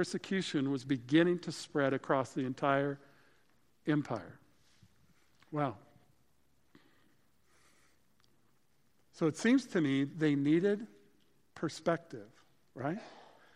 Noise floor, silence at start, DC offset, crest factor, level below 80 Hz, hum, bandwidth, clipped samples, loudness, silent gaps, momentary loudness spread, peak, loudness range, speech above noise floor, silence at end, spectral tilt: -75 dBFS; 0 s; under 0.1%; 22 dB; -78 dBFS; none; 11.5 kHz; under 0.1%; -34 LUFS; none; 14 LU; -14 dBFS; 13 LU; 42 dB; 0.35 s; -6 dB/octave